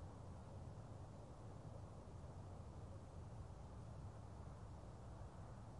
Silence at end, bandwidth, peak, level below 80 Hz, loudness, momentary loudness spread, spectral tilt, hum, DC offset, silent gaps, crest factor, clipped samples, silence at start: 0 s; 11 kHz; -44 dBFS; -62 dBFS; -57 LUFS; 1 LU; -7.5 dB/octave; none; under 0.1%; none; 12 dB; under 0.1%; 0 s